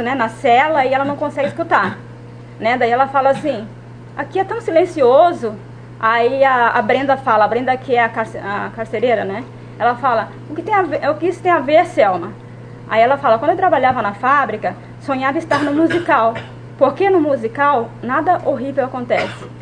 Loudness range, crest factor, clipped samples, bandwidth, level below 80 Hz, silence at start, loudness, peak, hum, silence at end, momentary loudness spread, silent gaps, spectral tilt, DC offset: 3 LU; 16 dB; under 0.1%; 10 kHz; -50 dBFS; 0 s; -16 LUFS; 0 dBFS; none; 0 s; 14 LU; none; -6.5 dB/octave; under 0.1%